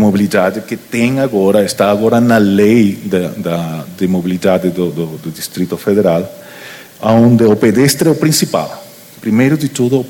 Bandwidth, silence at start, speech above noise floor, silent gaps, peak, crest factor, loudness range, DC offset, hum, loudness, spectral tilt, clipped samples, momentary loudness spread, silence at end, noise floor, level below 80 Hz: 18 kHz; 0 s; 21 dB; none; 0 dBFS; 12 dB; 4 LU; under 0.1%; none; -12 LUFS; -6 dB/octave; under 0.1%; 13 LU; 0 s; -33 dBFS; -50 dBFS